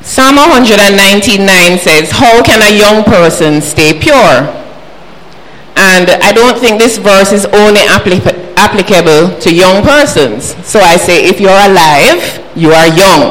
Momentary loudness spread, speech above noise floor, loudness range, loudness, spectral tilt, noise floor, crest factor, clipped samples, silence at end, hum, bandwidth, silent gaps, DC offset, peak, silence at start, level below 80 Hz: 6 LU; 27 dB; 3 LU; -4 LUFS; -3.5 dB/octave; -32 dBFS; 6 dB; 4%; 0 s; none; over 20 kHz; none; 6%; 0 dBFS; 0.05 s; -30 dBFS